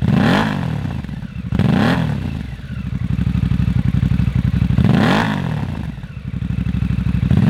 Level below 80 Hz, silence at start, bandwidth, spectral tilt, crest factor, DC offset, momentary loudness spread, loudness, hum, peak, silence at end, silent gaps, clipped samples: -28 dBFS; 0 s; 13 kHz; -7.5 dB/octave; 16 dB; under 0.1%; 13 LU; -18 LUFS; none; 0 dBFS; 0 s; none; under 0.1%